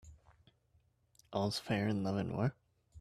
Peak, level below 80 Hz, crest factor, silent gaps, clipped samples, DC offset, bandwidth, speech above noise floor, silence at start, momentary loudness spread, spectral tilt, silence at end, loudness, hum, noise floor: -20 dBFS; -66 dBFS; 20 dB; none; under 0.1%; under 0.1%; 13.5 kHz; 38 dB; 0.05 s; 3 LU; -6.5 dB/octave; 0 s; -37 LUFS; none; -73 dBFS